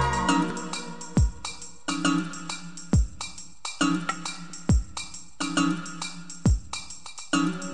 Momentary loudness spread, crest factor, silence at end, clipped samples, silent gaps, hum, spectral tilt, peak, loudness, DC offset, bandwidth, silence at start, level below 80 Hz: 11 LU; 18 dB; 0 s; under 0.1%; none; none; -4.5 dB/octave; -8 dBFS; -28 LUFS; 0.9%; 10 kHz; 0 s; -34 dBFS